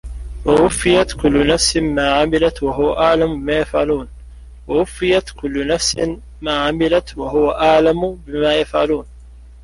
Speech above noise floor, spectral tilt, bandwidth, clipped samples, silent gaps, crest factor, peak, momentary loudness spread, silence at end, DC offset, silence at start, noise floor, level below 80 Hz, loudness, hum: 23 dB; -4 dB/octave; 11.5 kHz; under 0.1%; none; 16 dB; -2 dBFS; 9 LU; 0 s; under 0.1%; 0.05 s; -39 dBFS; -32 dBFS; -16 LUFS; none